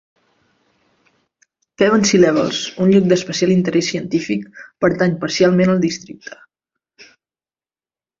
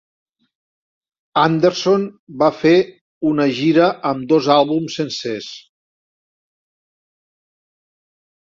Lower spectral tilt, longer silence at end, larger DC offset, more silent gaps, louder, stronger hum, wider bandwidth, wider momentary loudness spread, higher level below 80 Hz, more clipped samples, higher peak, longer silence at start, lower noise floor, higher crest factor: about the same, -5.5 dB/octave vs -6 dB/octave; second, 1.15 s vs 2.9 s; neither; second, none vs 2.19-2.27 s, 3.01-3.21 s; about the same, -16 LUFS vs -17 LUFS; neither; about the same, 7.6 kHz vs 7.6 kHz; about the same, 13 LU vs 13 LU; first, -56 dBFS vs -62 dBFS; neither; about the same, -2 dBFS vs -2 dBFS; first, 1.8 s vs 1.35 s; about the same, under -90 dBFS vs under -90 dBFS; about the same, 16 dB vs 18 dB